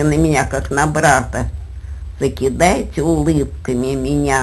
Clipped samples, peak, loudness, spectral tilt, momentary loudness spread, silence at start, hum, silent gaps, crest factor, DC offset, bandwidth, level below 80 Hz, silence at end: under 0.1%; 0 dBFS; -17 LUFS; -5.5 dB/octave; 12 LU; 0 s; none; none; 16 dB; under 0.1%; 12 kHz; -28 dBFS; 0 s